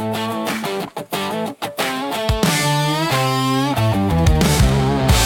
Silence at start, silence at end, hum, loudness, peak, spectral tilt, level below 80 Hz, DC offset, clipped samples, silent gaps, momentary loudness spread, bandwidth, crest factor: 0 s; 0 s; none; -18 LUFS; -2 dBFS; -5 dB/octave; -26 dBFS; under 0.1%; under 0.1%; none; 9 LU; 17.5 kHz; 16 dB